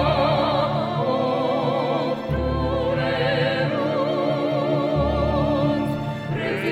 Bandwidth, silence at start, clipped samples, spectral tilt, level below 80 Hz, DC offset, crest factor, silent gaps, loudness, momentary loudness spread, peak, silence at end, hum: 12 kHz; 0 s; under 0.1%; -7.5 dB/octave; -36 dBFS; under 0.1%; 14 dB; none; -22 LUFS; 4 LU; -8 dBFS; 0 s; none